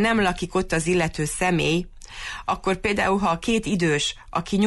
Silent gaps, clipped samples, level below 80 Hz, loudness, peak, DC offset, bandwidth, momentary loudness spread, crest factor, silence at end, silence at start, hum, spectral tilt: none; under 0.1%; -40 dBFS; -23 LUFS; -10 dBFS; under 0.1%; 11.5 kHz; 8 LU; 12 dB; 0 s; 0 s; none; -4.5 dB/octave